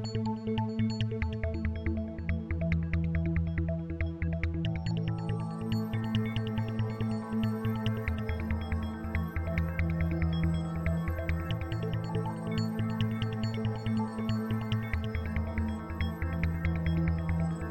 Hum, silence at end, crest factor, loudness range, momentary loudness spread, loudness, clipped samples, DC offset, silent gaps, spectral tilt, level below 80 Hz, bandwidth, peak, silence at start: none; 0 s; 16 dB; 1 LU; 4 LU; -33 LUFS; under 0.1%; under 0.1%; none; -8 dB/octave; -40 dBFS; 16.5 kHz; -16 dBFS; 0 s